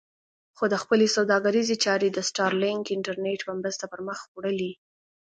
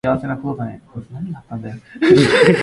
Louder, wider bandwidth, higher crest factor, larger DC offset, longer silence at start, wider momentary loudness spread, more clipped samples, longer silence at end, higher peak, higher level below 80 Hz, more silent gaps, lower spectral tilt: second, -26 LUFS vs -15 LUFS; second, 9.4 kHz vs 11.5 kHz; about the same, 18 dB vs 16 dB; neither; first, 0.6 s vs 0.05 s; second, 11 LU vs 21 LU; neither; first, 0.5 s vs 0 s; second, -8 dBFS vs 0 dBFS; second, -74 dBFS vs -48 dBFS; first, 4.28-4.35 s vs none; second, -3.5 dB/octave vs -6 dB/octave